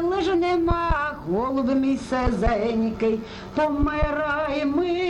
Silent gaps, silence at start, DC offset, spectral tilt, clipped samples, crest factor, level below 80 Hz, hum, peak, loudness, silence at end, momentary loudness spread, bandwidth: none; 0 s; under 0.1%; -7 dB/octave; under 0.1%; 16 dB; -34 dBFS; none; -8 dBFS; -23 LUFS; 0 s; 4 LU; 11 kHz